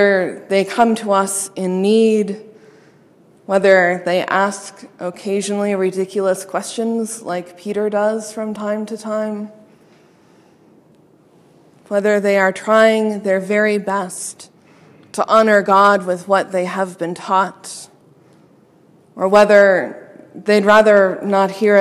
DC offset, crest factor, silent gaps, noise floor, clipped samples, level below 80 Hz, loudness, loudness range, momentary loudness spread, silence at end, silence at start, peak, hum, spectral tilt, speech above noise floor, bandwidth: under 0.1%; 16 dB; none; -51 dBFS; under 0.1%; -64 dBFS; -16 LUFS; 8 LU; 15 LU; 0 s; 0 s; 0 dBFS; none; -4.5 dB/octave; 35 dB; 13.5 kHz